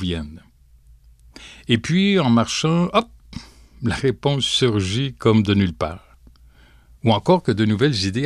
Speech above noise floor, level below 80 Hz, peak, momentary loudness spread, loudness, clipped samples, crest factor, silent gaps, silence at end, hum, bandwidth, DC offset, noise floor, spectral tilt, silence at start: 32 dB; -44 dBFS; -4 dBFS; 19 LU; -19 LUFS; under 0.1%; 16 dB; none; 0 s; none; 12 kHz; under 0.1%; -51 dBFS; -5.5 dB/octave; 0 s